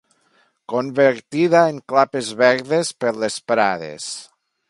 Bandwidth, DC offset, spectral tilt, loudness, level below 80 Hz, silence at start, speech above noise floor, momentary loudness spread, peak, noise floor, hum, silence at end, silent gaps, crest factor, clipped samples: 11.5 kHz; under 0.1%; -4.5 dB/octave; -19 LUFS; -68 dBFS; 0.7 s; 43 dB; 12 LU; 0 dBFS; -61 dBFS; none; 0.45 s; none; 20 dB; under 0.1%